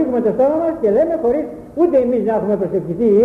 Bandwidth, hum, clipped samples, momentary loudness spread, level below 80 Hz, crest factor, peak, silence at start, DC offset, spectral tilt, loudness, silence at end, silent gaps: 5.2 kHz; none; under 0.1%; 5 LU; -48 dBFS; 12 dB; -4 dBFS; 0 s; under 0.1%; -10 dB/octave; -17 LUFS; 0 s; none